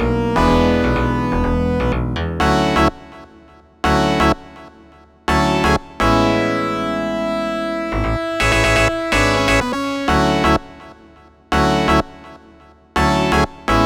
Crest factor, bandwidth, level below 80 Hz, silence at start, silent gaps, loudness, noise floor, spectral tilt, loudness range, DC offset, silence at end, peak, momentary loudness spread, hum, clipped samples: 16 dB; 19.5 kHz; -28 dBFS; 0 s; none; -17 LUFS; -46 dBFS; -5.5 dB/octave; 3 LU; under 0.1%; 0 s; 0 dBFS; 6 LU; none; under 0.1%